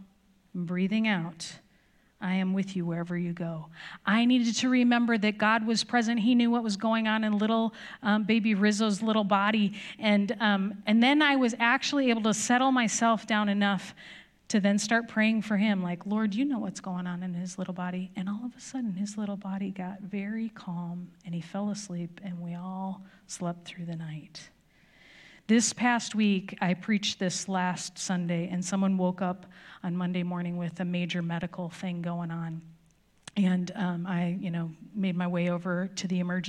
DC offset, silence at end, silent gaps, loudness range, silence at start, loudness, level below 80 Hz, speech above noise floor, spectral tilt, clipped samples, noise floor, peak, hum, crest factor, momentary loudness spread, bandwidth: under 0.1%; 0 s; none; 10 LU; 0 s; -28 LUFS; -72 dBFS; 36 dB; -5 dB/octave; under 0.1%; -64 dBFS; -10 dBFS; none; 20 dB; 13 LU; 11.5 kHz